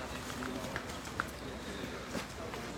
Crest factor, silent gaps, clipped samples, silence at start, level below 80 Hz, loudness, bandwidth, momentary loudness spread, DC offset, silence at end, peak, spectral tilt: 26 dB; none; under 0.1%; 0 s; -54 dBFS; -41 LUFS; 19.5 kHz; 3 LU; under 0.1%; 0 s; -16 dBFS; -4 dB/octave